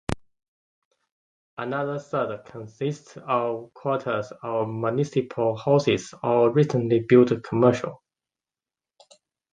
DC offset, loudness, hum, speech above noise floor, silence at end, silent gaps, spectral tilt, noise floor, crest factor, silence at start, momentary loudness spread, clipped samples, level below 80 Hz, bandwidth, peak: under 0.1%; -24 LUFS; none; over 67 dB; 1.6 s; 0.48-0.91 s, 1.12-1.57 s; -7 dB/octave; under -90 dBFS; 20 dB; 0.1 s; 15 LU; under 0.1%; -54 dBFS; 11 kHz; -4 dBFS